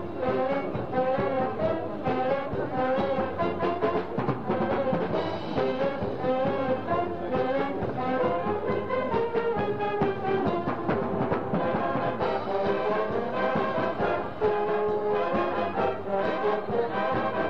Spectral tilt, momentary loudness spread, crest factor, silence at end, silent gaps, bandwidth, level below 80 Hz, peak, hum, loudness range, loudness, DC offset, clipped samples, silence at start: -8.5 dB/octave; 2 LU; 14 dB; 0 s; none; 6.6 kHz; -54 dBFS; -12 dBFS; none; 1 LU; -28 LUFS; 0.9%; under 0.1%; 0 s